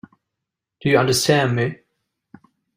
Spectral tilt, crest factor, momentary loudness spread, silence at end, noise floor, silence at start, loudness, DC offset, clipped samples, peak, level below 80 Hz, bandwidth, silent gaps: -4.5 dB/octave; 20 dB; 10 LU; 1.05 s; -83 dBFS; 0.85 s; -18 LUFS; under 0.1%; under 0.1%; -2 dBFS; -56 dBFS; 16 kHz; none